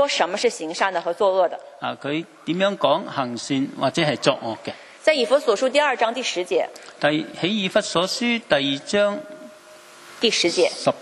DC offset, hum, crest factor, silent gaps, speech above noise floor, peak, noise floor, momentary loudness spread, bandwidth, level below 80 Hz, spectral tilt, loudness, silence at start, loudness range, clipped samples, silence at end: under 0.1%; none; 22 dB; none; 24 dB; 0 dBFS; -46 dBFS; 9 LU; 12.5 kHz; -66 dBFS; -3.5 dB/octave; -22 LUFS; 0 s; 2 LU; under 0.1%; 0 s